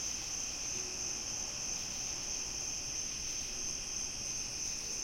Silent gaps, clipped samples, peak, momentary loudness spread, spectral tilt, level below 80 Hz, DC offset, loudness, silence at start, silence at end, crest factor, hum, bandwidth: none; under 0.1%; -24 dBFS; 1 LU; 0 dB/octave; -56 dBFS; under 0.1%; -36 LUFS; 0 s; 0 s; 14 dB; none; 16.5 kHz